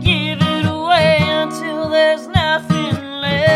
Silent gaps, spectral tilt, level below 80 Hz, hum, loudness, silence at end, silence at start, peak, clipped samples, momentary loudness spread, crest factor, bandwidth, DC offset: none; -6 dB/octave; -38 dBFS; none; -16 LUFS; 0 s; 0 s; 0 dBFS; under 0.1%; 8 LU; 14 dB; 14.5 kHz; under 0.1%